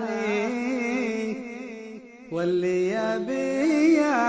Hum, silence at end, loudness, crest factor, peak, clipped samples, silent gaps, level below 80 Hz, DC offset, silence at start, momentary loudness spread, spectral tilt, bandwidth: none; 0 s; -25 LUFS; 14 dB; -10 dBFS; under 0.1%; none; -66 dBFS; under 0.1%; 0 s; 17 LU; -5.5 dB/octave; 8 kHz